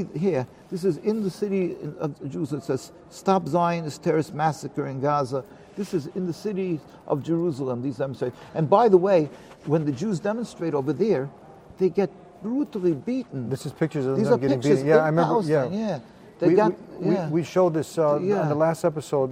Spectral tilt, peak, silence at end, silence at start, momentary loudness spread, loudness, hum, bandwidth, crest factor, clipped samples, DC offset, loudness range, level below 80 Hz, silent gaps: -7.5 dB/octave; -4 dBFS; 0 s; 0 s; 11 LU; -24 LUFS; none; 15.5 kHz; 20 dB; under 0.1%; under 0.1%; 5 LU; -64 dBFS; none